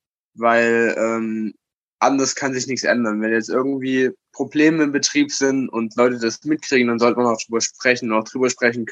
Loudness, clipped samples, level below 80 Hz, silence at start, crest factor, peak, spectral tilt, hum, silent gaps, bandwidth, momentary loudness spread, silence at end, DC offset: -19 LUFS; under 0.1%; -72 dBFS; 0.4 s; 18 dB; -2 dBFS; -3.5 dB/octave; none; 1.77-1.99 s; 8.6 kHz; 7 LU; 0 s; under 0.1%